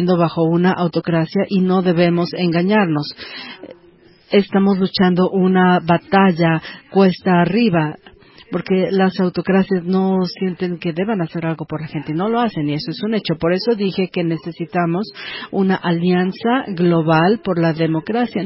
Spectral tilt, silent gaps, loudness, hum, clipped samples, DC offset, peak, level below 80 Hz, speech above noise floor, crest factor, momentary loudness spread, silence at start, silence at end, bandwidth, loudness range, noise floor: -11.5 dB/octave; none; -17 LUFS; none; under 0.1%; under 0.1%; 0 dBFS; -54 dBFS; 32 dB; 16 dB; 10 LU; 0 s; 0 s; 5.8 kHz; 5 LU; -48 dBFS